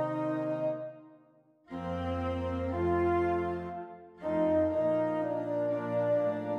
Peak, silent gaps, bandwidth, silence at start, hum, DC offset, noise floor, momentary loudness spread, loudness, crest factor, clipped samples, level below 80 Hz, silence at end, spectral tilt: -18 dBFS; none; 6.6 kHz; 0 s; none; under 0.1%; -63 dBFS; 12 LU; -32 LUFS; 12 dB; under 0.1%; -54 dBFS; 0 s; -9 dB/octave